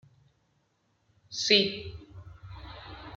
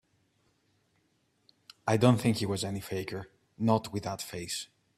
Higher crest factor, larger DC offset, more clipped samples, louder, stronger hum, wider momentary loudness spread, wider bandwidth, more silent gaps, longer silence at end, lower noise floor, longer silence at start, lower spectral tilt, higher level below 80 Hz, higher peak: about the same, 26 dB vs 24 dB; neither; neither; first, -25 LUFS vs -31 LUFS; neither; first, 26 LU vs 13 LU; second, 8.8 kHz vs 15 kHz; neither; second, 0 s vs 0.3 s; about the same, -73 dBFS vs -73 dBFS; second, 1.3 s vs 1.85 s; second, -3 dB/octave vs -5.5 dB/octave; first, -56 dBFS vs -64 dBFS; about the same, -8 dBFS vs -8 dBFS